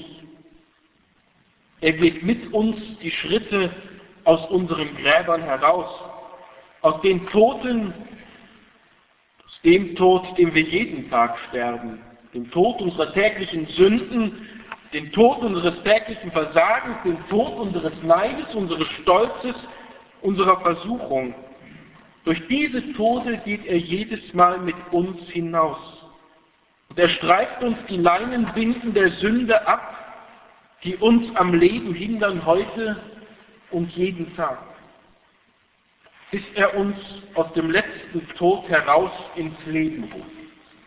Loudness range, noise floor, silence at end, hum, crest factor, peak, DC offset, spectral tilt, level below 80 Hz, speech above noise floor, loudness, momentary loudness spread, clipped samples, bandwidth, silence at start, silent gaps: 5 LU; -62 dBFS; 0.4 s; none; 22 dB; 0 dBFS; under 0.1%; -9.5 dB/octave; -52 dBFS; 42 dB; -21 LUFS; 14 LU; under 0.1%; 4 kHz; 0 s; none